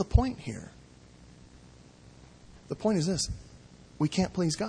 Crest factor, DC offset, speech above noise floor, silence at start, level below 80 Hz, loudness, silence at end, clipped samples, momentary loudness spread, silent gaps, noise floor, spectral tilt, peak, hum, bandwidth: 24 dB; under 0.1%; 25 dB; 0 s; -40 dBFS; -30 LUFS; 0 s; under 0.1%; 17 LU; none; -54 dBFS; -5.5 dB/octave; -8 dBFS; none; 10.5 kHz